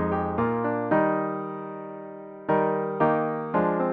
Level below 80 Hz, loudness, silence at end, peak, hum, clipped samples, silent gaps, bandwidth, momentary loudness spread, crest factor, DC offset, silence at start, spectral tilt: -56 dBFS; -26 LUFS; 0 s; -10 dBFS; 60 Hz at -65 dBFS; under 0.1%; none; 4.7 kHz; 14 LU; 16 dB; under 0.1%; 0 s; -11 dB/octave